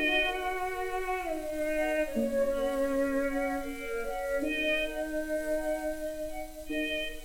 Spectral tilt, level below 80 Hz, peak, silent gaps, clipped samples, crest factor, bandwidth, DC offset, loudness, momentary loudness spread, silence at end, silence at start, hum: -3.5 dB/octave; -46 dBFS; -16 dBFS; none; under 0.1%; 14 dB; 16.5 kHz; under 0.1%; -32 LUFS; 7 LU; 0 s; 0 s; none